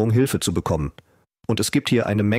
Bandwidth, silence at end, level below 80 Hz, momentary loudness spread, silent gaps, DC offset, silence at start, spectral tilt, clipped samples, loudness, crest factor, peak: 16 kHz; 0 s; -42 dBFS; 9 LU; none; under 0.1%; 0 s; -5.5 dB/octave; under 0.1%; -22 LUFS; 14 dB; -8 dBFS